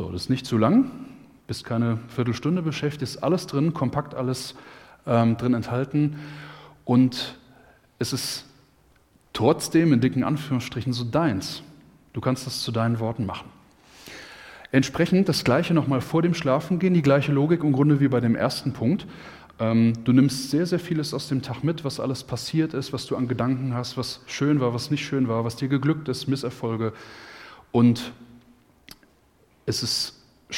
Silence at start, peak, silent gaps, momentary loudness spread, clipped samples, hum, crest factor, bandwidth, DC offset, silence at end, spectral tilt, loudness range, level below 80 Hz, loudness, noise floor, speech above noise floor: 0 s; -4 dBFS; none; 17 LU; under 0.1%; none; 20 dB; 16.5 kHz; under 0.1%; 0 s; -6 dB/octave; 6 LU; -56 dBFS; -24 LUFS; -60 dBFS; 37 dB